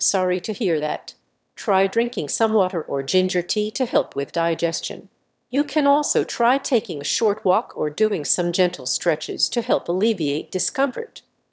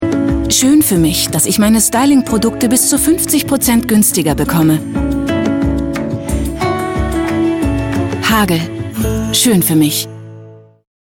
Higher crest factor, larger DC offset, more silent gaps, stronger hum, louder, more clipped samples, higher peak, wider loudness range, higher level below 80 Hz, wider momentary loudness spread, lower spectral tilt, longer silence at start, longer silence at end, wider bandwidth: first, 18 dB vs 12 dB; neither; neither; neither; second, -22 LUFS vs -13 LUFS; neither; second, -4 dBFS vs 0 dBFS; second, 2 LU vs 5 LU; second, -74 dBFS vs -28 dBFS; about the same, 7 LU vs 8 LU; about the same, -3.5 dB/octave vs -4 dB/octave; about the same, 0 s vs 0 s; second, 0.35 s vs 0.5 s; second, 8 kHz vs 17 kHz